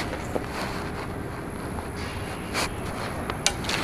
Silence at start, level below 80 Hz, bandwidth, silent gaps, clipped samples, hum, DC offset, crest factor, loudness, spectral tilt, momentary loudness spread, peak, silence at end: 0 s; -42 dBFS; 15.5 kHz; none; under 0.1%; none; under 0.1%; 28 dB; -30 LUFS; -3.5 dB/octave; 8 LU; -2 dBFS; 0 s